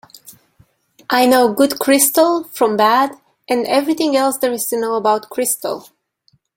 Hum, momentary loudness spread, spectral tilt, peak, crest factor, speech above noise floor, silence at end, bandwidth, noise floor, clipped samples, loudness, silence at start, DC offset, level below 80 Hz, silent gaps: none; 9 LU; -2.5 dB/octave; 0 dBFS; 16 dB; 45 dB; 0.75 s; 17 kHz; -60 dBFS; under 0.1%; -15 LUFS; 0.3 s; under 0.1%; -62 dBFS; none